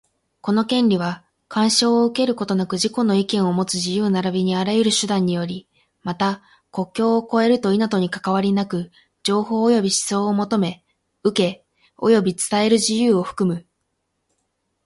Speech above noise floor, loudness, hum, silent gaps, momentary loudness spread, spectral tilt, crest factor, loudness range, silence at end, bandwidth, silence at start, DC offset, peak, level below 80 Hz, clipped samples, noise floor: 54 dB; -20 LUFS; none; none; 10 LU; -4.5 dB/octave; 16 dB; 2 LU; 1.25 s; 11.5 kHz; 0.45 s; under 0.1%; -4 dBFS; -62 dBFS; under 0.1%; -73 dBFS